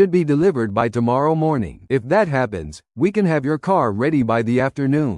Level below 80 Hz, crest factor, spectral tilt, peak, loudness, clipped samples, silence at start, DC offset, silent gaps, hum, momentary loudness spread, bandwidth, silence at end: -50 dBFS; 14 dB; -8 dB/octave; -4 dBFS; -19 LUFS; under 0.1%; 0 s; under 0.1%; none; none; 6 LU; 11.5 kHz; 0 s